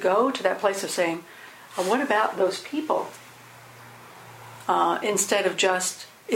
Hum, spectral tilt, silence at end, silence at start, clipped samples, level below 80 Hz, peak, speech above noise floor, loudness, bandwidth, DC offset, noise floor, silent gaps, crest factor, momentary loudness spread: none; -2.5 dB/octave; 0 s; 0 s; under 0.1%; -74 dBFS; -6 dBFS; 23 dB; -24 LUFS; 16.5 kHz; under 0.1%; -47 dBFS; none; 20 dB; 22 LU